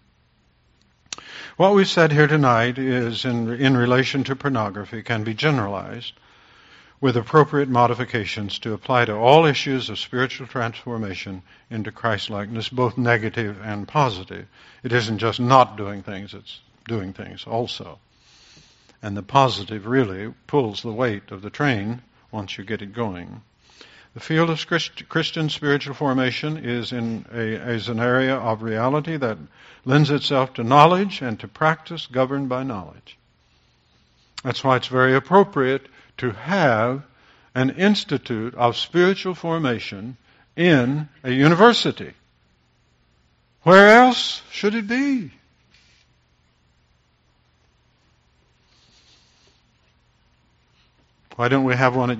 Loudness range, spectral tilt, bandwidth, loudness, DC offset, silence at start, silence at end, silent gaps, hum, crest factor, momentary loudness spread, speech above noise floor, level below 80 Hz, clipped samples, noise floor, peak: 9 LU; -4 dB/octave; 8 kHz; -20 LUFS; under 0.1%; 1.1 s; 0 s; none; none; 22 dB; 18 LU; 42 dB; -58 dBFS; under 0.1%; -62 dBFS; 0 dBFS